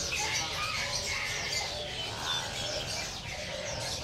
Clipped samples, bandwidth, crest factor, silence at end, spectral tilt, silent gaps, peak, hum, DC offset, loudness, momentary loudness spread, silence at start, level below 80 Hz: under 0.1%; 16 kHz; 16 dB; 0 s; -1.5 dB/octave; none; -20 dBFS; none; under 0.1%; -32 LUFS; 6 LU; 0 s; -50 dBFS